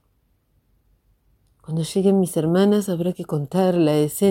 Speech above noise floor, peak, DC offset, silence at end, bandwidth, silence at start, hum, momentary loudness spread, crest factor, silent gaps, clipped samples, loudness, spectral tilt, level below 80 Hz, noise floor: 46 dB; -6 dBFS; under 0.1%; 0 s; 17 kHz; 1.7 s; none; 8 LU; 16 dB; none; under 0.1%; -20 LUFS; -6.5 dB/octave; -60 dBFS; -65 dBFS